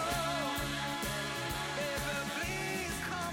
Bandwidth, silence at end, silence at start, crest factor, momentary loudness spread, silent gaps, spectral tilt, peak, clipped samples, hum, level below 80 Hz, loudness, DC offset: 17 kHz; 0 s; 0 s; 14 dB; 2 LU; none; -3.5 dB/octave; -22 dBFS; under 0.1%; none; -50 dBFS; -35 LUFS; under 0.1%